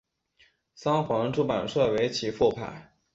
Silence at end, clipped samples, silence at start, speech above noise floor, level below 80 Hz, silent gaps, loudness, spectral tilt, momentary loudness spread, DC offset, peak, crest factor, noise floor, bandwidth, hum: 0.3 s; under 0.1%; 0.8 s; 38 dB; -58 dBFS; none; -27 LUFS; -5.5 dB/octave; 12 LU; under 0.1%; -10 dBFS; 18 dB; -65 dBFS; 8 kHz; none